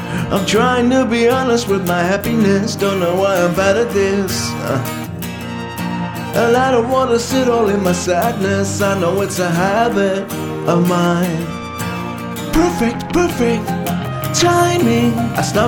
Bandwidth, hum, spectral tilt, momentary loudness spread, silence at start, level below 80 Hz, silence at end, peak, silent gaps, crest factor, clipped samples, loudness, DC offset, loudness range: 18 kHz; none; -5 dB/octave; 9 LU; 0 s; -40 dBFS; 0 s; 0 dBFS; none; 14 dB; under 0.1%; -16 LUFS; under 0.1%; 3 LU